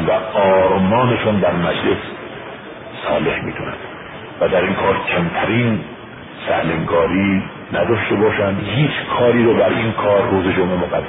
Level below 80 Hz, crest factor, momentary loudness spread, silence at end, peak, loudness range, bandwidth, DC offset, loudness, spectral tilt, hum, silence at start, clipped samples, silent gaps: -42 dBFS; 14 dB; 17 LU; 0 s; -2 dBFS; 5 LU; 4 kHz; under 0.1%; -17 LUFS; -12 dB/octave; none; 0 s; under 0.1%; none